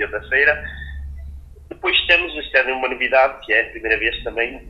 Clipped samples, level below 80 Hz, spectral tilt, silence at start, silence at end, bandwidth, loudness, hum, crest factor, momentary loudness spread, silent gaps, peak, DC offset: under 0.1%; -38 dBFS; -5 dB/octave; 0 s; 0 s; 7.6 kHz; -17 LUFS; none; 20 dB; 17 LU; none; 0 dBFS; under 0.1%